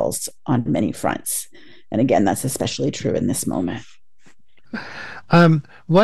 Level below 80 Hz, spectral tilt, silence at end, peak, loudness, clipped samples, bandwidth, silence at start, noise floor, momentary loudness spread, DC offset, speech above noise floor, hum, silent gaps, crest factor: -50 dBFS; -5.5 dB/octave; 0 s; -2 dBFS; -20 LUFS; under 0.1%; 13 kHz; 0 s; -58 dBFS; 18 LU; 1%; 39 dB; none; none; 20 dB